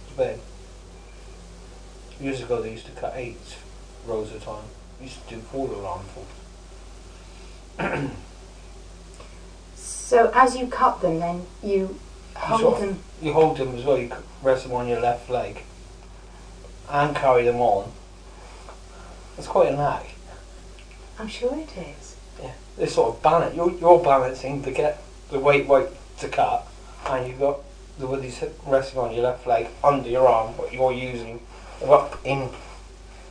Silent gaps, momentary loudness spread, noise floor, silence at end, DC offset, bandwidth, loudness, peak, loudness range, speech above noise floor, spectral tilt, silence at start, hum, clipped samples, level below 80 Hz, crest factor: none; 26 LU; -43 dBFS; 0 s; under 0.1%; 10.5 kHz; -23 LUFS; 0 dBFS; 13 LU; 20 dB; -5.5 dB/octave; 0 s; none; under 0.1%; -44 dBFS; 24 dB